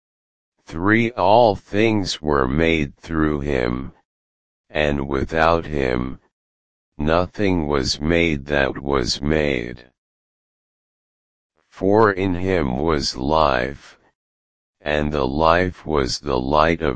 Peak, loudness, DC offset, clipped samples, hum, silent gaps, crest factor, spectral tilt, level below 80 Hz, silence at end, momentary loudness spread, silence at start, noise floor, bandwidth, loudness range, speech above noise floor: 0 dBFS; -20 LUFS; 2%; under 0.1%; none; 4.05-4.64 s, 6.32-6.92 s, 9.98-11.50 s, 14.15-14.74 s; 20 dB; -5.5 dB/octave; -36 dBFS; 0 s; 9 LU; 0.5 s; under -90 dBFS; 9.8 kHz; 4 LU; over 71 dB